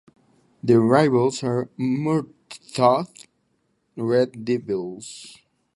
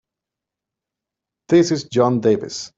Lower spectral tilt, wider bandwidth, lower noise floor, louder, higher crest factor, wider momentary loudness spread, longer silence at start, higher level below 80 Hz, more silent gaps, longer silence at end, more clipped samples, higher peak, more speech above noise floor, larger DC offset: about the same, -6.5 dB/octave vs -6 dB/octave; first, 11.5 kHz vs 7.8 kHz; second, -69 dBFS vs -86 dBFS; second, -22 LUFS vs -18 LUFS; about the same, 22 dB vs 18 dB; first, 20 LU vs 3 LU; second, 0.65 s vs 1.5 s; about the same, -64 dBFS vs -60 dBFS; neither; first, 0.45 s vs 0.1 s; neither; about the same, -2 dBFS vs -2 dBFS; second, 48 dB vs 69 dB; neither